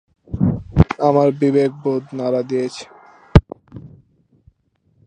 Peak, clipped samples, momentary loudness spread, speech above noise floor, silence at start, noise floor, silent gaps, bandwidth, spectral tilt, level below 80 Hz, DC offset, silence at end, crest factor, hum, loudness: 0 dBFS; under 0.1%; 16 LU; 45 dB; 0.3 s; -62 dBFS; none; 10 kHz; -8.5 dB/octave; -30 dBFS; under 0.1%; 1.2 s; 18 dB; none; -18 LUFS